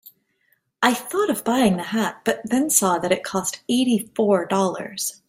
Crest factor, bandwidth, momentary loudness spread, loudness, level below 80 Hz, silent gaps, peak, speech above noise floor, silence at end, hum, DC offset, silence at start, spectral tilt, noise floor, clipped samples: 20 dB; 16.5 kHz; 7 LU; -21 LUFS; -62 dBFS; none; -2 dBFS; 46 dB; 0.15 s; none; under 0.1%; 0.05 s; -3.5 dB/octave; -67 dBFS; under 0.1%